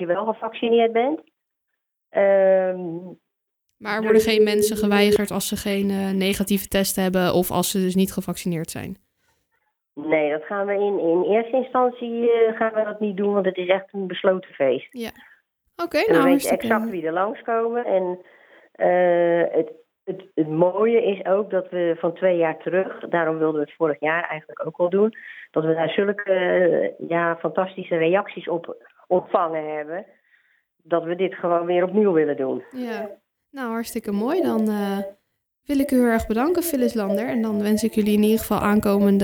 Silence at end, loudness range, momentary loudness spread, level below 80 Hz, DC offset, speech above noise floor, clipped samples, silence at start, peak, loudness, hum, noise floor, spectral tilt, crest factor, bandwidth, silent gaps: 0 s; 4 LU; 11 LU; -54 dBFS; under 0.1%; 58 dB; under 0.1%; 0 s; -4 dBFS; -22 LUFS; none; -79 dBFS; -5.5 dB/octave; 18 dB; over 20 kHz; none